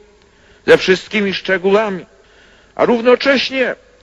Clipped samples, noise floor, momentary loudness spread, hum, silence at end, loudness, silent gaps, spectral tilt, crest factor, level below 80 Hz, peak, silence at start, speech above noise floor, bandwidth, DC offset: under 0.1%; -48 dBFS; 11 LU; none; 0.3 s; -14 LUFS; none; -5 dB/octave; 16 dB; -52 dBFS; 0 dBFS; 0.65 s; 35 dB; 8.6 kHz; under 0.1%